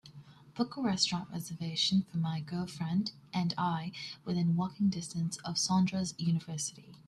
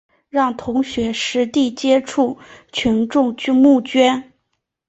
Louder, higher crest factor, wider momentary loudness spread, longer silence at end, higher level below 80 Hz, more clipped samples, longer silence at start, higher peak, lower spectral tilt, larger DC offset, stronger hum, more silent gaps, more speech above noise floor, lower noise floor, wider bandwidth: second, -33 LUFS vs -17 LUFS; about the same, 20 dB vs 16 dB; about the same, 9 LU vs 8 LU; second, 0.05 s vs 0.65 s; second, -68 dBFS vs -50 dBFS; neither; second, 0.05 s vs 0.35 s; second, -14 dBFS vs -2 dBFS; about the same, -4.5 dB/octave vs -4.5 dB/octave; neither; neither; neither; second, 21 dB vs 57 dB; second, -54 dBFS vs -73 dBFS; first, 13.5 kHz vs 8.2 kHz